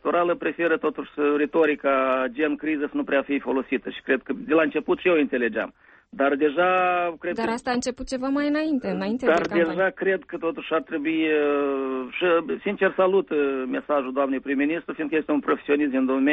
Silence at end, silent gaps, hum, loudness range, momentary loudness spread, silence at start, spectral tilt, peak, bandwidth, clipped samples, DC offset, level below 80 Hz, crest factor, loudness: 0 s; none; none; 1 LU; 6 LU; 0.05 s; -5.5 dB/octave; -8 dBFS; 8.4 kHz; under 0.1%; under 0.1%; -58 dBFS; 14 dB; -24 LUFS